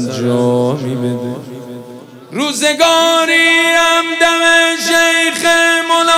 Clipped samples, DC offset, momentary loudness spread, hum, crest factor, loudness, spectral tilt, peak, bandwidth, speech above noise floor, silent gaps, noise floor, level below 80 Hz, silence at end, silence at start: under 0.1%; under 0.1%; 17 LU; none; 12 dB; -11 LUFS; -3 dB/octave; 0 dBFS; 17 kHz; 21 dB; none; -33 dBFS; -56 dBFS; 0 s; 0 s